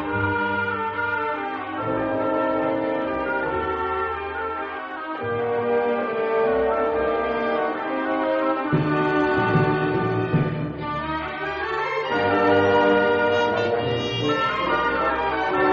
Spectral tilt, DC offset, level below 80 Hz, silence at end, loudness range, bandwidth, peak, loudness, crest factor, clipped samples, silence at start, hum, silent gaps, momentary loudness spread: -4 dB/octave; under 0.1%; -50 dBFS; 0 s; 4 LU; 7 kHz; -8 dBFS; -23 LUFS; 16 dB; under 0.1%; 0 s; none; none; 8 LU